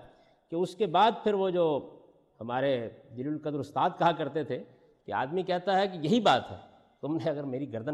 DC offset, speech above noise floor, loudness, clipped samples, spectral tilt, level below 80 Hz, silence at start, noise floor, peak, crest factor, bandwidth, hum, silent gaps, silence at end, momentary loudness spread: under 0.1%; 29 dB; -29 LUFS; under 0.1%; -6 dB/octave; -70 dBFS; 0 s; -58 dBFS; -12 dBFS; 18 dB; 12 kHz; none; none; 0 s; 14 LU